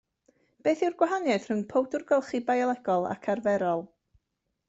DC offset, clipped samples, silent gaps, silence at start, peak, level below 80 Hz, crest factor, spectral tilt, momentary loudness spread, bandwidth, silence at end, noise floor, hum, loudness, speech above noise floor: under 0.1%; under 0.1%; none; 0.65 s; -10 dBFS; -72 dBFS; 18 dB; -6 dB/octave; 4 LU; 8 kHz; 0.8 s; -81 dBFS; none; -28 LUFS; 54 dB